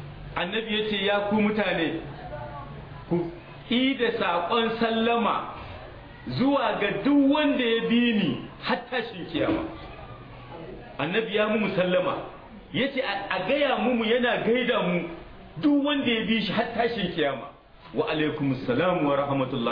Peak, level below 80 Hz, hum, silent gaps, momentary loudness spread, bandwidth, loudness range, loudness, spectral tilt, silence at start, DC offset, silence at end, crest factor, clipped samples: -10 dBFS; -52 dBFS; none; none; 18 LU; 5.2 kHz; 4 LU; -25 LUFS; -8.5 dB/octave; 0 s; under 0.1%; 0 s; 16 dB; under 0.1%